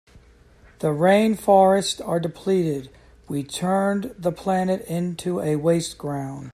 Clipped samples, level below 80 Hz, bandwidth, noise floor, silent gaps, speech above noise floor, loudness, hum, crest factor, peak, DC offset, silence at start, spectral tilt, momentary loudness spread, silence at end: under 0.1%; -54 dBFS; 14.5 kHz; -52 dBFS; none; 30 dB; -22 LUFS; none; 18 dB; -4 dBFS; under 0.1%; 0.15 s; -6 dB/octave; 12 LU; 0.05 s